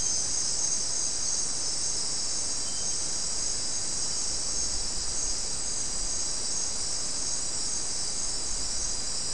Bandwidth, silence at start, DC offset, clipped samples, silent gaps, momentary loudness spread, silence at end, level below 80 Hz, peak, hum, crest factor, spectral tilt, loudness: 12 kHz; 0 s; 2%; under 0.1%; none; 3 LU; 0 s; -46 dBFS; -16 dBFS; none; 14 dB; 0 dB/octave; -28 LUFS